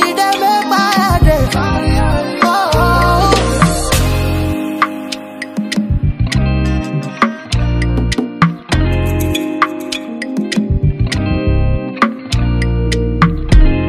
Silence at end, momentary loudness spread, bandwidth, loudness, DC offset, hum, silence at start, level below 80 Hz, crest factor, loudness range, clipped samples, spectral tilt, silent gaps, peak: 0 s; 7 LU; 15.5 kHz; -14 LUFS; under 0.1%; none; 0 s; -18 dBFS; 14 dB; 4 LU; under 0.1%; -5.5 dB/octave; none; 0 dBFS